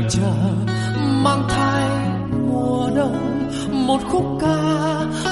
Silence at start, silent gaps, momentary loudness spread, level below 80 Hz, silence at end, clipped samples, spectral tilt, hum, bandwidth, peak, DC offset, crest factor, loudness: 0 s; none; 4 LU; -40 dBFS; 0 s; under 0.1%; -6 dB/octave; none; 11.5 kHz; -4 dBFS; under 0.1%; 14 dB; -20 LUFS